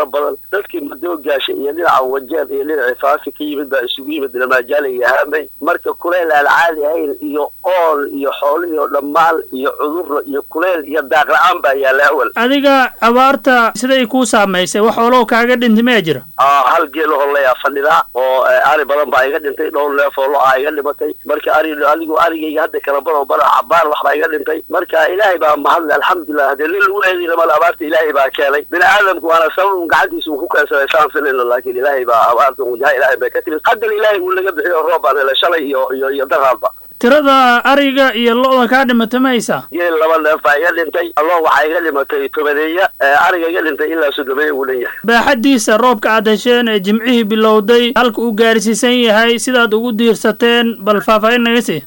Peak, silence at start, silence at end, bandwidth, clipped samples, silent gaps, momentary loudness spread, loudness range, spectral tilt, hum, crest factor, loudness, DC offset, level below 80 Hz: 0 dBFS; 0 s; 0 s; 18 kHz; under 0.1%; none; 8 LU; 4 LU; -3.5 dB/octave; none; 12 dB; -12 LUFS; under 0.1%; -52 dBFS